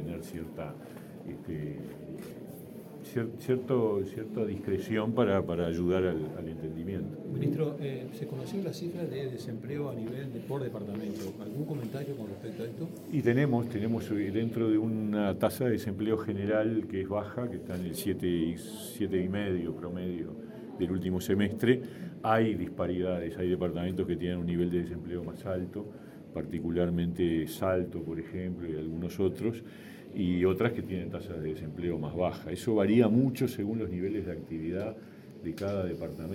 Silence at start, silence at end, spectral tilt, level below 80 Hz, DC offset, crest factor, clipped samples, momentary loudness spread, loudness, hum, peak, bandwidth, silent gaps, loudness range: 0 s; 0 s; -7.5 dB/octave; -58 dBFS; under 0.1%; 22 dB; under 0.1%; 13 LU; -32 LUFS; none; -10 dBFS; 16 kHz; none; 7 LU